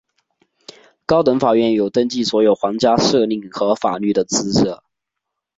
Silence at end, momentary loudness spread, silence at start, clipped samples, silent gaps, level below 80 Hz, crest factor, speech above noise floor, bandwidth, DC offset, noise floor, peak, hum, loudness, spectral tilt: 0.8 s; 6 LU; 1.1 s; under 0.1%; none; -52 dBFS; 16 dB; 64 dB; 8 kHz; under 0.1%; -80 dBFS; -2 dBFS; none; -17 LUFS; -4.5 dB/octave